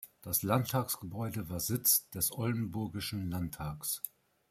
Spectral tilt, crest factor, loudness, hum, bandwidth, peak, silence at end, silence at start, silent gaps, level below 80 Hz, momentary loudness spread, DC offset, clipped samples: -4 dB/octave; 20 dB; -33 LUFS; none; 16 kHz; -14 dBFS; 0.4 s; 0 s; none; -60 dBFS; 11 LU; under 0.1%; under 0.1%